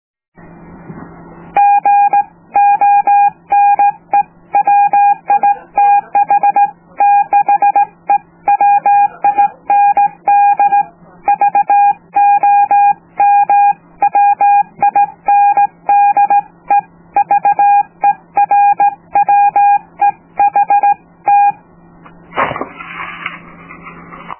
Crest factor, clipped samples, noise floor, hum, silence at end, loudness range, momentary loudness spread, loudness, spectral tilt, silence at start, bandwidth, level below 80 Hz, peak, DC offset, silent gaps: 10 dB; under 0.1%; -41 dBFS; none; 0.05 s; 2 LU; 7 LU; -11 LUFS; -7.5 dB/octave; 0.9 s; 3.2 kHz; -56 dBFS; -2 dBFS; under 0.1%; none